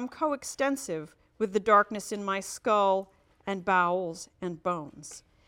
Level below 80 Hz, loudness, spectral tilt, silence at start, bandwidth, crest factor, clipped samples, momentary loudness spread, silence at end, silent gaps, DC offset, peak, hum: -66 dBFS; -29 LUFS; -4 dB/octave; 0 s; 16.5 kHz; 20 dB; under 0.1%; 19 LU; 0.3 s; none; under 0.1%; -8 dBFS; none